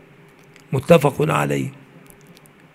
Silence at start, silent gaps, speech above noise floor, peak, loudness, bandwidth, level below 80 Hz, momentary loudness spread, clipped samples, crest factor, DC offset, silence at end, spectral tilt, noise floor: 0.7 s; none; 31 dB; 0 dBFS; -18 LUFS; 16 kHz; -52 dBFS; 12 LU; under 0.1%; 22 dB; under 0.1%; 1 s; -6.5 dB/octave; -48 dBFS